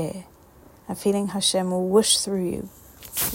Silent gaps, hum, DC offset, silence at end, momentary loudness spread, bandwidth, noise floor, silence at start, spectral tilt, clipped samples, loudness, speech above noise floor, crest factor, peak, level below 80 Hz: none; none; under 0.1%; 0 s; 19 LU; 16.5 kHz; -51 dBFS; 0 s; -3.5 dB/octave; under 0.1%; -22 LUFS; 27 dB; 20 dB; -4 dBFS; -54 dBFS